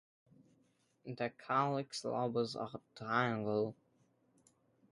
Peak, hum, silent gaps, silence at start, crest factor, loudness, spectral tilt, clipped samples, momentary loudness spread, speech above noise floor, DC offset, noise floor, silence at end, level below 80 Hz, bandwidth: -18 dBFS; none; none; 1.05 s; 22 dB; -38 LUFS; -5.5 dB/octave; under 0.1%; 12 LU; 37 dB; under 0.1%; -75 dBFS; 1.2 s; -80 dBFS; 11.5 kHz